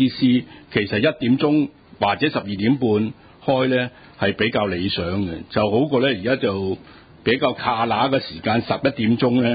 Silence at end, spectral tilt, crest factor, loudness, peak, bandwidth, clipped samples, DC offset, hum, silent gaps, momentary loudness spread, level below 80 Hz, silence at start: 0 s; -11 dB/octave; 16 dB; -21 LUFS; -4 dBFS; 5 kHz; under 0.1%; under 0.1%; none; none; 7 LU; -48 dBFS; 0 s